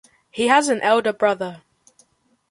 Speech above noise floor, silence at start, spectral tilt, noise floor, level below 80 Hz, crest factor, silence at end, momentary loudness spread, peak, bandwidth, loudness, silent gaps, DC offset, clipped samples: 43 dB; 0.35 s; -3 dB/octave; -62 dBFS; -68 dBFS; 20 dB; 0.95 s; 13 LU; -2 dBFS; 11.5 kHz; -19 LUFS; none; under 0.1%; under 0.1%